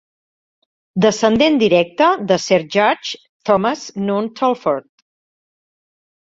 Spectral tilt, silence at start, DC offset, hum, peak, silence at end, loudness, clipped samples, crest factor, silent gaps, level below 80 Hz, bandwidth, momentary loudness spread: -5 dB/octave; 0.95 s; under 0.1%; none; -2 dBFS; 1.6 s; -16 LUFS; under 0.1%; 16 dB; 3.29-3.40 s; -56 dBFS; 7.8 kHz; 10 LU